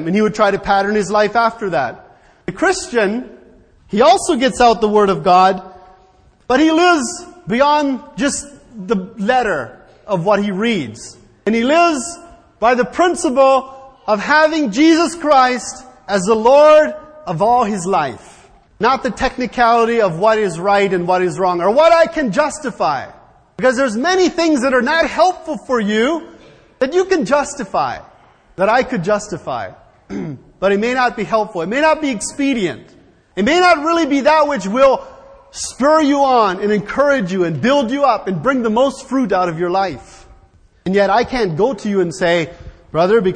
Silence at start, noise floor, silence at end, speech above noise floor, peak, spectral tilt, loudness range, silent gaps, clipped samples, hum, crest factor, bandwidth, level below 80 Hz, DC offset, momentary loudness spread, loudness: 0 s; -50 dBFS; 0 s; 36 dB; 0 dBFS; -4.5 dB/octave; 5 LU; none; under 0.1%; none; 16 dB; 10.5 kHz; -46 dBFS; under 0.1%; 13 LU; -15 LUFS